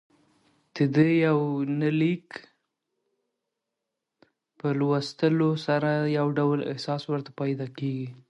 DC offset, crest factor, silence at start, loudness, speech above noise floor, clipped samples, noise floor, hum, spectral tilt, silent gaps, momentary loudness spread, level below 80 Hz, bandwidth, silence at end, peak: under 0.1%; 18 dB; 0.75 s; -26 LUFS; 59 dB; under 0.1%; -85 dBFS; none; -8 dB/octave; none; 10 LU; -72 dBFS; 8.8 kHz; 0.15 s; -8 dBFS